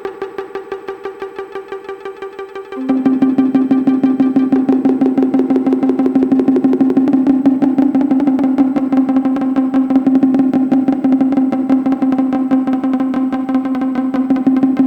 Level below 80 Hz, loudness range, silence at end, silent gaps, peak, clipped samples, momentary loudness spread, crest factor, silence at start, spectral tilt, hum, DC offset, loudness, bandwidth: -54 dBFS; 4 LU; 0 s; none; -2 dBFS; under 0.1%; 14 LU; 12 dB; 0 s; -8.5 dB/octave; none; under 0.1%; -14 LUFS; 4.6 kHz